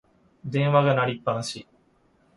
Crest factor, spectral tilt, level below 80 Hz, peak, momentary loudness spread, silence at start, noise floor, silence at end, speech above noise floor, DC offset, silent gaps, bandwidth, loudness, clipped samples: 20 dB; -6 dB/octave; -64 dBFS; -6 dBFS; 17 LU; 0.45 s; -63 dBFS; 0.75 s; 40 dB; under 0.1%; none; 11.5 kHz; -24 LUFS; under 0.1%